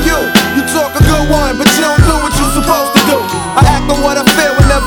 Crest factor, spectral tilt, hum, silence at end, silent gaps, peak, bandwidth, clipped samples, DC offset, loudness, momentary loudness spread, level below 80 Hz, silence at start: 10 dB; -4.5 dB/octave; none; 0 s; none; 0 dBFS; over 20 kHz; 0.4%; under 0.1%; -10 LUFS; 3 LU; -18 dBFS; 0 s